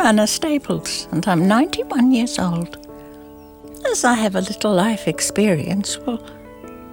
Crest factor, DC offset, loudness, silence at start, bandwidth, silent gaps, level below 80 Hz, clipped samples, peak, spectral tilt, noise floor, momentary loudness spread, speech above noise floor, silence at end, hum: 18 dB; under 0.1%; -19 LUFS; 0 s; 19.5 kHz; none; -50 dBFS; under 0.1%; -2 dBFS; -4.5 dB/octave; -40 dBFS; 22 LU; 22 dB; 0 s; none